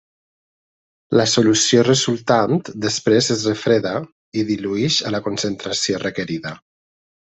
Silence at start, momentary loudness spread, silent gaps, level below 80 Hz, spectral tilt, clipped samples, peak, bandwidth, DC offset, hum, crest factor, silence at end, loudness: 1.1 s; 11 LU; 4.12-4.32 s; -58 dBFS; -4 dB/octave; under 0.1%; -2 dBFS; 8.4 kHz; under 0.1%; none; 18 dB; 0.8 s; -18 LUFS